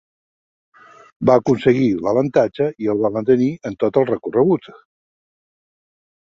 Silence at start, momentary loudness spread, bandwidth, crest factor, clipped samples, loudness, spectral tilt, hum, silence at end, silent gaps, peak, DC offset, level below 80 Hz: 1.2 s; 6 LU; 7.4 kHz; 18 dB; under 0.1%; -18 LUFS; -8 dB/octave; none; 1.5 s; none; -2 dBFS; under 0.1%; -56 dBFS